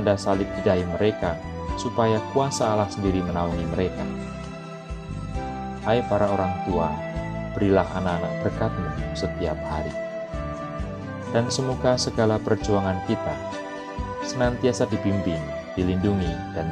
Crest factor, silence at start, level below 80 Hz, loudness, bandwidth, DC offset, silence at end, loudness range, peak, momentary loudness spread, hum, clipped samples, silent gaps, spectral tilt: 20 dB; 0 s; -40 dBFS; -25 LUFS; 11 kHz; under 0.1%; 0 s; 3 LU; -4 dBFS; 10 LU; none; under 0.1%; none; -6 dB/octave